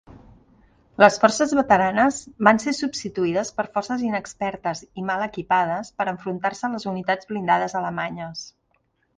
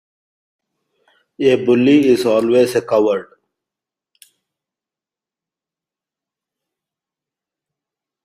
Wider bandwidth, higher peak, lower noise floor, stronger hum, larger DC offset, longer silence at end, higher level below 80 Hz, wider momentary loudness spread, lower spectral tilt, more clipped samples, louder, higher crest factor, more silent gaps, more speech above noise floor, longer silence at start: second, 10 kHz vs 15 kHz; about the same, 0 dBFS vs -2 dBFS; second, -68 dBFS vs -89 dBFS; neither; neither; second, 0.7 s vs 5 s; about the same, -58 dBFS vs -62 dBFS; first, 12 LU vs 7 LU; second, -4.5 dB/octave vs -6 dB/octave; neither; second, -22 LUFS vs -14 LUFS; about the same, 22 dB vs 18 dB; neither; second, 46 dB vs 75 dB; second, 0.1 s vs 1.4 s